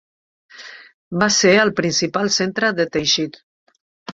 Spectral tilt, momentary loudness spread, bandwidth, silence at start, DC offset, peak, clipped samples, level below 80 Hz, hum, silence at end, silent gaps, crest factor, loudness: -3 dB/octave; 24 LU; 7.8 kHz; 0.55 s; under 0.1%; -2 dBFS; under 0.1%; -56 dBFS; none; 0 s; 0.94-1.11 s, 3.43-3.67 s, 3.81-4.06 s; 18 dB; -17 LUFS